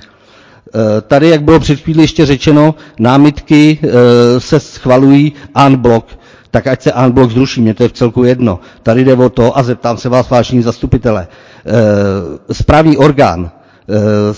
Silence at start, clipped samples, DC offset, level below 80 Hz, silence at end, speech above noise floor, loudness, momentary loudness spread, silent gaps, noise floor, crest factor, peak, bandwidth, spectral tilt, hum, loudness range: 0.75 s; 4%; under 0.1%; -30 dBFS; 0 s; 33 dB; -9 LUFS; 8 LU; none; -41 dBFS; 8 dB; 0 dBFS; 8 kHz; -7 dB/octave; none; 3 LU